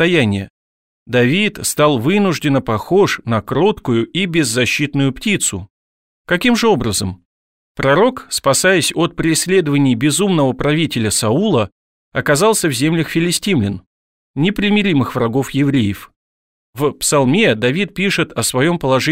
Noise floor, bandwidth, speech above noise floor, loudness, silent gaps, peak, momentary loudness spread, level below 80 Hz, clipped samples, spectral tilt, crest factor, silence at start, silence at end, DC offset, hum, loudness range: under -90 dBFS; 16.5 kHz; over 75 dB; -15 LUFS; 0.50-1.06 s, 5.70-6.25 s, 7.25-7.75 s, 11.72-12.11 s, 13.86-14.34 s, 16.16-16.73 s; 0 dBFS; 7 LU; -44 dBFS; under 0.1%; -4.5 dB/octave; 14 dB; 0 s; 0 s; 0.3%; none; 3 LU